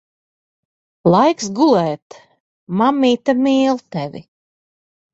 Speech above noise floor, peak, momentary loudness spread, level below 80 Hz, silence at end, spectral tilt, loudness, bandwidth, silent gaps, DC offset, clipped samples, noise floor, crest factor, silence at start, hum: over 74 dB; -2 dBFS; 13 LU; -60 dBFS; 0.95 s; -6 dB/octave; -16 LUFS; 8 kHz; 2.02-2.10 s, 2.40-2.67 s; under 0.1%; under 0.1%; under -90 dBFS; 16 dB; 1.05 s; none